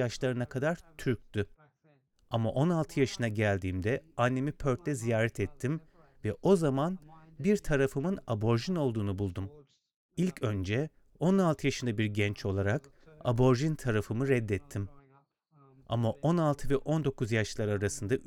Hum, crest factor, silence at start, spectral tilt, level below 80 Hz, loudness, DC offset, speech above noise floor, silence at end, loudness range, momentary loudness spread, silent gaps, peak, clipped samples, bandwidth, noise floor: none; 20 dB; 0 s; -6.5 dB/octave; -52 dBFS; -31 LUFS; under 0.1%; 38 dB; 0 s; 2 LU; 9 LU; 9.96-10.09 s; -12 dBFS; under 0.1%; 15.5 kHz; -69 dBFS